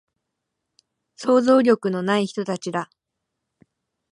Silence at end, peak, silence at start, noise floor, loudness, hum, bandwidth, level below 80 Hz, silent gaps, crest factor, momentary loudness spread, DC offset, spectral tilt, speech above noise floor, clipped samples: 1.3 s; -6 dBFS; 1.2 s; -81 dBFS; -21 LUFS; none; 11 kHz; -72 dBFS; none; 18 dB; 13 LU; under 0.1%; -6 dB/octave; 61 dB; under 0.1%